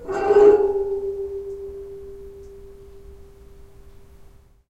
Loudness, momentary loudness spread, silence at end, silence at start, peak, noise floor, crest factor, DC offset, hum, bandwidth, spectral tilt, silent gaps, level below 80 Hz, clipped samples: -18 LUFS; 27 LU; 0.8 s; 0 s; -4 dBFS; -48 dBFS; 20 dB; under 0.1%; none; 8 kHz; -7 dB/octave; none; -46 dBFS; under 0.1%